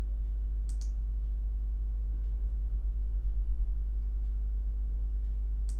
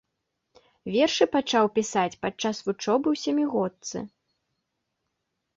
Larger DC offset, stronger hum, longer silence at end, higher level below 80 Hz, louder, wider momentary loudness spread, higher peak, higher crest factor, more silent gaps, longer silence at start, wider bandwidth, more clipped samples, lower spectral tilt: neither; neither; second, 0 s vs 1.5 s; first, -32 dBFS vs -66 dBFS; second, -36 LUFS vs -25 LUFS; second, 1 LU vs 13 LU; second, -22 dBFS vs -8 dBFS; second, 10 dB vs 20 dB; neither; second, 0 s vs 0.85 s; second, 1.1 kHz vs 8 kHz; neither; first, -7.5 dB/octave vs -4 dB/octave